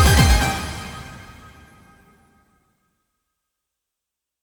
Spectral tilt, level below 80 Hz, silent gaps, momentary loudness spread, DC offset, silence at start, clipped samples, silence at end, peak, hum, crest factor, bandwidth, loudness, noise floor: -4 dB/octave; -28 dBFS; none; 26 LU; under 0.1%; 0 s; under 0.1%; 3.25 s; -2 dBFS; none; 22 dB; over 20 kHz; -19 LUFS; -84 dBFS